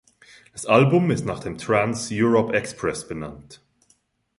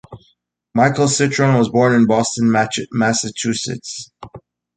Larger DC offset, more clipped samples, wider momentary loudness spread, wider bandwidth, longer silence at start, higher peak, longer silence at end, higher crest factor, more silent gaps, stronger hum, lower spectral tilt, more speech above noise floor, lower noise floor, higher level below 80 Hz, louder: neither; neither; first, 16 LU vs 12 LU; first, 11.5 kHz vs 9.6 kHz; first, 0.55 s vs 0.1 s; about the same, -4 dBFS vs -2 dBFS; first, 0.85 s vs 0.4 s; about the same, 20 dB vs 16 dB; neither; neither; first, -6 dB/octave vs -4.5 dB/octave; about the same, 43 dB vs 45 dB; about the same, -64 dBFS vs -62 dBFS; about the same, -54 dBFS vs -54 dBFS; second, -21 LUFS vs -16 LUFS